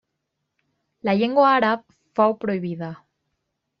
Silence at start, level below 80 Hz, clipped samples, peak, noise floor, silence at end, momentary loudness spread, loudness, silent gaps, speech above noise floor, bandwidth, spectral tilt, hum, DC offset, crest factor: 1.05 s; -68 dBFS; under 0.1%; -6 dBFS; -78 dBFS; 0.85 s; 14 LU; -21 LUFS; none; 58 dB; 6.2 kHz; -4.5 dB/octave; none; under 0.1%; 18 dB